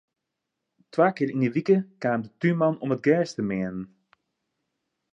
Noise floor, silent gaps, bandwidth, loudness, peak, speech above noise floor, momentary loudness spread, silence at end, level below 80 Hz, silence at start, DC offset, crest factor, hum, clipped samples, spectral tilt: -83 dBFS; none; 8.2 kHz; -25 LUFS; -8 dBFS; 59 dB; 9 LU; 1.25 s; -66 dBFS; 0.95 s; under 0.1%; 18 dB; none; under 0.1%; -8 dB/octave